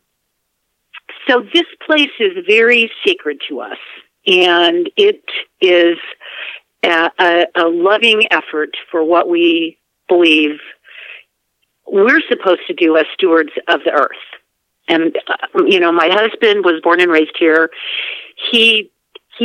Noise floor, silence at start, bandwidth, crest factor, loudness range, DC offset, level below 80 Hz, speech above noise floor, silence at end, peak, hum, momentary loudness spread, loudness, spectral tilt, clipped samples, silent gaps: -69 dBFS; 0.95 s; 9.6 kHz; 14 dB; 2 LU; under 0.1%; -74 dBFS; 56 dB; 0 s; 0 dBFS; none; 14 LU; -12 LUFS; -4 dB/octave; under 0.1%; none